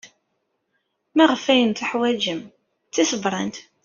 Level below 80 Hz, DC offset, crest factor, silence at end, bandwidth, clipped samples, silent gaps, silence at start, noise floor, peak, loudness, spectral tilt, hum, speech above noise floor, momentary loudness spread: -66 dBFS; under 0.1%; 22 dB; 0.25 s; 7.4 kHz; under 0.1%; none; 0.05 s; -73 dBFS; -2 dBFS; -21 LUFS; -2.5 dB/octave; none; 53 dB; 11 LU